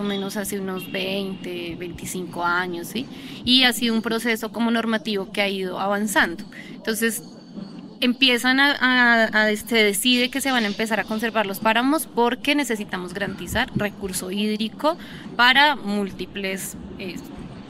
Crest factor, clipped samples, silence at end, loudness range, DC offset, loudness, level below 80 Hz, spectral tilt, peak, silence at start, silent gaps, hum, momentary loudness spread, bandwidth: 22 dB; under 0.1%; 0 s; 6 LU; under 0.1%; -21 LUFS; -52 dBFS; -3 dB/octave; -2 dBFS; 0 s; none; none; 16 LU; 16 kHz